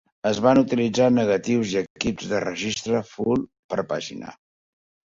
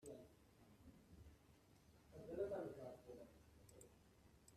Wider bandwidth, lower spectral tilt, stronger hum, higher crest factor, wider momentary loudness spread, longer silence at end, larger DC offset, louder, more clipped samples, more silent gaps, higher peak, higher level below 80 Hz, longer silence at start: second, 7.8 kHz vs 13.5 kHz; about the same, -5.5 dB/octave vs -6.5 dB/octave; neither; about the same, 18 dB vs 22 dB; second, 11 LU vs 20 LU; first, 0.8 s vs 0 s; neither; first, -23 LUFS vs -54 LUFS; neither; first, 1.90-1.95 s, 3.59-3.69 s vs none; first, -4 dBFS vs -36 dBFS; first, -56 dBFS vs -74 dBFS; first, 0.25 s vs 0 s